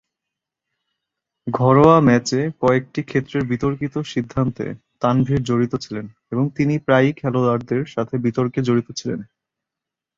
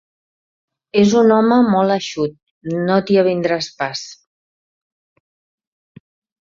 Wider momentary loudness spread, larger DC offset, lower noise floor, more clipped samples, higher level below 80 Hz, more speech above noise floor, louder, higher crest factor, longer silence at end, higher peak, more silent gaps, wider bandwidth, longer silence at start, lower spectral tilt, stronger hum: about the same, 13 LU vs 13 LU; neither; second, -86 dBFS vs under -90 dBFS; neither; first, -50 dBFS vs -60 dBFS; second, 67 dB vs over 75 dB; second, -19 LUFS vs -16 LUFS; about the same, 18 dB vs 16 dB; second, 0.95 s vs 2.35 s; about the same, -2 dBFS vs -2 dBFS; second, none vs 2.43-2.61 s; about the same, 7.8 kHz vs 7.6 kHz; first, 1.45 s vs 0.95 s; about the same, -7 dB/octave vs -6 dB/octave; neither